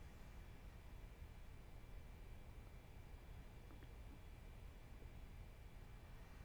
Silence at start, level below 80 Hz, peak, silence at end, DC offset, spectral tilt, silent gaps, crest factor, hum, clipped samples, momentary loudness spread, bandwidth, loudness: 0 s; -58 dBFS; -44 dBFS; 0 s; under 0.1%; -6 dB/octave; none; 12 dB; none; under 0.1%; 1 LU; over 20 kHz; -61 LUFS